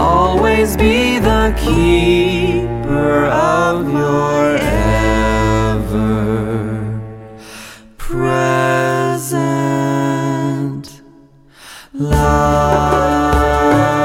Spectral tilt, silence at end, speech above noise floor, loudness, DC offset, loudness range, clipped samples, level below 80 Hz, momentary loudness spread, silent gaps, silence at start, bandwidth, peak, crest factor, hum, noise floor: -6 dB/octave; 0 s; 31 dB; -14 LUFS; under 0.1%; 5 LU; under 0.1%; -24 dBFS; 11 LU; none; 0 s; 16.5 kHz; 0 dBFS; 14 dB; none; -44 dBFS